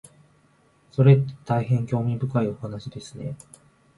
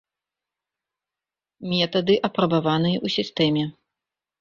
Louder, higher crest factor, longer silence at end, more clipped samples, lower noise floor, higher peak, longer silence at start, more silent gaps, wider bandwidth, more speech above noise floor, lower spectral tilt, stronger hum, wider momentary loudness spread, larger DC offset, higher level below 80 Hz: about the same, -23 LUFS vs -22 LUFS; about the same, 20 dB vs 18 dB; about the same, 0.6 s vs 0.7 s; neither; second, -60 dBFS vs -89 dBFS; about the same, -4 dBFS vs -6 dBFS; second, 0.95 s vs 1.6 s; neither; first, 11.5 kHz vs 7.2 kHz; second, 38 dB vs 68 dB; first, -8.5 dB/octave vs -7 dB/octave; second, none vs 50 Hz at -45 dBFS; first, 18 LU vs 6 LU; neither; about the same, -58 dBFS vs -62 dBFS